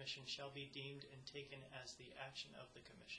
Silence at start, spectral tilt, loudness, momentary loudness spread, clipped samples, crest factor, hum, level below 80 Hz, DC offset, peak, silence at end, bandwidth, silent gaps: 0 s; -3 dB/octave; -53 LUFS; 8 LU; under 0.1%; 20 dB; none; -78 dBFS; under 0.1%; -36 dBFS; 0 s; 11 kHz; none